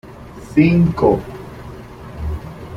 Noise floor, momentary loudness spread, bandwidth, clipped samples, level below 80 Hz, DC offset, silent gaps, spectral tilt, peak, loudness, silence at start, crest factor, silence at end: -35 dBFS; 22 LU; 10 kHz; under 0.1%; -34 dBFS; under 0.1%; none; -9 dB/octave; -2 dBFS; -16 LUFS; 0.05 s; 16 dB; 0 s